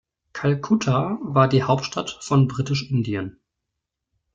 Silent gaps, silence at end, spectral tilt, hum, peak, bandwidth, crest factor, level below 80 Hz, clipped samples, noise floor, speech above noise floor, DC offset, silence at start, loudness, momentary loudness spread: none; 1.05 s; -6.5 dB/octave; none; -4 dBFS; 7.6 kHz; 20 dB; -56 dBFS; under 0.1%; -82 dBFS; 61 dB; under 0.1%; 0.35 s; -22 LUFS; 11 LU